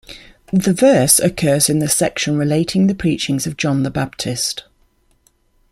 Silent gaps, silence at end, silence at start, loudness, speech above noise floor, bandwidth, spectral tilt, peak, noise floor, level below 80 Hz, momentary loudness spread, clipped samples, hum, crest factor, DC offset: none; 1.1 s; 0.1 s; -16 LUFS; 42 dB; 16 kHz; -4.5 dB/octave; 0 dBFS; -58 dBFS; -46 dBFS; 9 LU; under 0.1%; none; 18 dB; under 0.1%